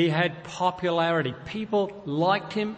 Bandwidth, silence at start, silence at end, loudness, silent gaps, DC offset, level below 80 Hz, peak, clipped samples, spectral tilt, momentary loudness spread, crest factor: 8.6 kHz; 0 s; 0 s; -26 LUFS; none; under 0.1%; -62 dBFS; -10 dBFS; under 0.1%; -6 dB/octave; 5 LU; 16 dB